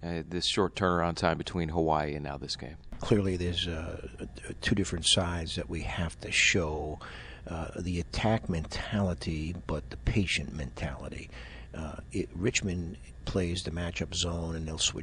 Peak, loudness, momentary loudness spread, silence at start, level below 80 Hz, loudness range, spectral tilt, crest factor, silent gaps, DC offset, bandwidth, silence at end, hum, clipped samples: -12 dBFS; -31 LUFS; 14 LU; 0 s; -44 dBFS; 5 LU; -4 dB/octave; 20 dB; none; under 0.1%; 11 kHz; 0 s; none; under 0.1%